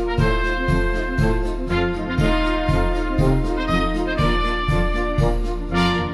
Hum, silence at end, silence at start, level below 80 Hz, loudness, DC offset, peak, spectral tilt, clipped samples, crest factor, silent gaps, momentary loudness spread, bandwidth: none; 0 s; 0 s; -24 dBFS; -21 LUFS; under 0.1%; -6 dBFS; -6.5 dB/octave; under 0.1%; 14 dB; none; 3 LU; 12 kHz